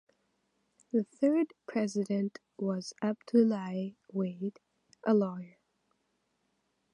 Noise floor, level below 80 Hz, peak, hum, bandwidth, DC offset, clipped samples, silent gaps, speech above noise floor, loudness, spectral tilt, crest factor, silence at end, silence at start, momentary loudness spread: -78 dBFS; -82 dBFS; -14 dBFS; none; 11 kHz; under 0.1%; under 0.1%; none; 47 dB; -32 LUFS; -7 dB/octave; 18 dB; 1.45 s; 0.95 s; 11 LU